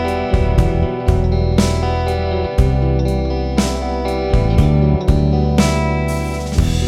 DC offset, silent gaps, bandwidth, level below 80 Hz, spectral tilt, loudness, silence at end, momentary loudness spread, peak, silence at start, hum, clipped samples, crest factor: under 0.1%; none; 14 kHz; -20 dBFS; -6.5 dB/octave; -16 LUFS; 0 s; 5 LU; 0 dBFS; 0 s; none; under 0.1%; 14 dB